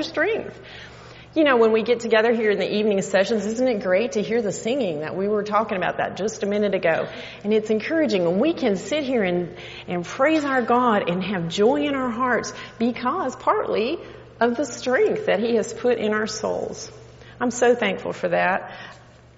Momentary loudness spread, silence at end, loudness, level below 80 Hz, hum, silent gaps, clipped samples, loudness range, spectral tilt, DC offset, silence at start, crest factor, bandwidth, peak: 11 LU; 0.4 s; -22 LUFS; -58 dBFS; none; none; under 0.1%; 3 LU; -4 dB/octave; under 0.1%; 0 s; 18 dB; 8 kHz; -4 dBFS